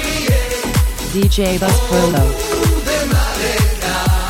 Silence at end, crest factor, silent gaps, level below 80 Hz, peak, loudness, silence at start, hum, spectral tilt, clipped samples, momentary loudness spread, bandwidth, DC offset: 0 s; 14 dB; none; -20 dBFS; 0 dBFS; -16 LUFS; 0 s; none; -4.5 dB/octave; under 0.1%; 3 LU; 16.5 kHz; under 0.1%